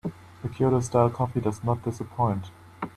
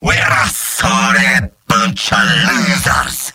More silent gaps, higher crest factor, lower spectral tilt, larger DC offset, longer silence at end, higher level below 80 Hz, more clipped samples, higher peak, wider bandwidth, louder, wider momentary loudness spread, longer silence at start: neither; first, 20 dB vs 14 dB; first, -8 dB/octave vs -3 dB/octave; neither; about the same, 0.05 s vs 0.05 s; second, -54 dBFS vs -32 dBFS; neither; second, -6 dBFS vs 0 dBFS; second, 12.5 kHz vs 16.5 kHz; second, -26 LUFS vs -12 LUFS; first, 15 LU vs 5 LU; about the same, 0.05 s vs 0 s